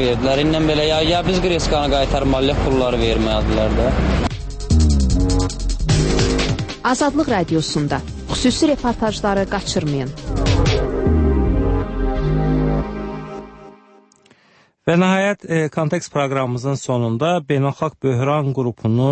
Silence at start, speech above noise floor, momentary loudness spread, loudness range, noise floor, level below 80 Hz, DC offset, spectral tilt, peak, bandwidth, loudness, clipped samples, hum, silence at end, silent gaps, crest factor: 0 s; 37 dB; 7 LU; 4 LU; -55 dBFS; -24 dBFS; under 0.1%; -5.5 dB/octave; -4 dBFS; 8.8 kHz; -18 LUFS; under 0.1%; none; 0 s; none; 14 dB